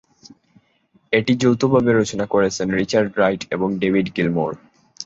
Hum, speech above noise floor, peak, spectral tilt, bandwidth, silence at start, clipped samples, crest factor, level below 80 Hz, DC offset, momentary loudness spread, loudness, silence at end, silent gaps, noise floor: none; 42 dB; -2 dBFS; -5.5 dB/octave; 8 kHz; 1.1 s; under 0.1%; 18 dB; -52 dBFS; under 0.1%; 7 LU; -19 LUFS; 0 s; none; -60 dBFS